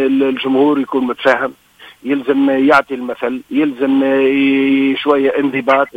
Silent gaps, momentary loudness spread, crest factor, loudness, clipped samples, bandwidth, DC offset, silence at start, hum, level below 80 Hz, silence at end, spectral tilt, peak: none; 8 LU; 14 dB; -14 LUFS; under 0.1%; 6.4 kHz; under 0.1%; 0 s; none; -56 dBFS; 0.05 s; -6 dB/octave; 0 dBFS